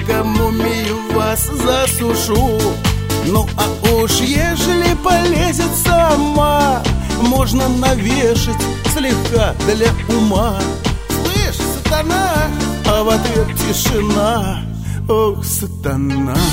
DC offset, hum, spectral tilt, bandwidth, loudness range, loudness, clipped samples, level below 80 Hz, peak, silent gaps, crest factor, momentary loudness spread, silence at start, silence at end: under 0.1%; none; -4.5 dB/octave; 16.5 kHz; 2 LU; -15 LUFS; under 0.1%; -24 dBFS; 0 dBFS; none; 14 dB; 5 LU; 0 s; 0 s